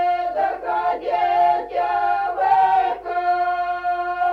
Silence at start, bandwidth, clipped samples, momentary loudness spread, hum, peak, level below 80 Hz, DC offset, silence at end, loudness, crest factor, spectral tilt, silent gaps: 0 s; 5.6 kHz; under 0.1%; 6 LU; none; -6 dBFS; -54 dBFS; under 0.1%; 0 s; -20 LUFS; 14 dB; -5 dB/octave; none